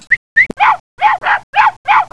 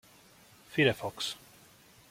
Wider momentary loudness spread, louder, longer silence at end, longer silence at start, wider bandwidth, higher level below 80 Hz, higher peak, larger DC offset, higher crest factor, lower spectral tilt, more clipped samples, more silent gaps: second, 4 LU vs 10 LU; first, -12 LUFS vs -31 LUFS; second, 0.05 s vs 0.75 s; second, 0.1 s vs 0.7 s; second, 11 kHz vs 16.5 kHz; first, -50 dBFS vs -68 dBFS; first, 0 dBFS vs -10 dBFS; first, 0.8% vs under 0.1%; second, 12 dB vs 24 dB; second, -2.5 dB/octave vs -4.5 dB/octave; neither; first, 0.17-0.36 s, 0.80-0.97 s, 1.43-1.53 s, 1.77-1.84 s vs none